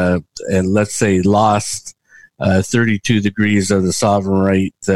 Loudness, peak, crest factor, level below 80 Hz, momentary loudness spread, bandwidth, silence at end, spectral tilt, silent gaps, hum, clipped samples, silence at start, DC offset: -15 LUFS; 0 dBFS; 14 dB; -46 dBFS; 7 LU; 12.5 kHz; 0 s; -5.5 dB/octave; none; none; under 0.1%; 0 s; 0.7%